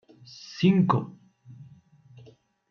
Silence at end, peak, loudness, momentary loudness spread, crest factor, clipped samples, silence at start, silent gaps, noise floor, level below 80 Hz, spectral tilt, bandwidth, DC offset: 1.1 s; -6 dBFS; -24 LUFS; 24 LU; 22 dB; under 0.1%; 0.5 s; none; -55 dBFS; -68 dBFS; -8 dB/octave; 6.6 kHz; under 0.1%